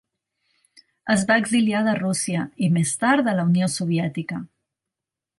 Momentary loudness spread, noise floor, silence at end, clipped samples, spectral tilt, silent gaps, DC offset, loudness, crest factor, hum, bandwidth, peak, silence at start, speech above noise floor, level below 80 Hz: 10 LU; -87 dBFS; 0.95 s; under 0.1%; -5 dB/octave; none; under 0.1%; -21 LUFS; 18 dB; none; 11.5 kHz; -6 dBFS; 1.05 s; 66 dB; -64 dBFS